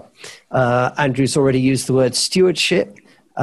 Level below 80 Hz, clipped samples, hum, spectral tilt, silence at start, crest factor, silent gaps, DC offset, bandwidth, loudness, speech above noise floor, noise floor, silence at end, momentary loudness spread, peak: -50 dBFS; under 0.1%; none; -4.5 dB/octave; 0.25 s; 12 dB; none; under 0.1%; 13 kHz; -17 LUFS; 24 dB; -40 dBFS; 0 s; 9 LU; -4 dBFS